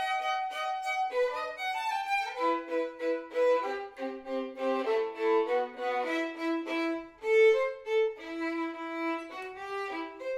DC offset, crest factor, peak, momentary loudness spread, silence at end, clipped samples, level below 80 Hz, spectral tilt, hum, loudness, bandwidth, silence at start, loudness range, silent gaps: under 0.1%; 16 dB; -14 dBFS; 9 LU; 0 s; under 0.1%; -74 dBFS; -2.5 dB/octave; none; -31 LUFS; 14.5 kHz; 0 s; 3 LU; none